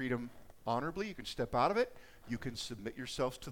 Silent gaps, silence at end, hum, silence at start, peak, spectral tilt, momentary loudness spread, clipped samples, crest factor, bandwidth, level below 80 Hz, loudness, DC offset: none; 0 s; none; 0 s; -18 dBFS; -5 dB/octave; 12 LU; under 0.1%; 20 dB; 18 kHz; -58 dBFS; -38 LUFS; under 0.1%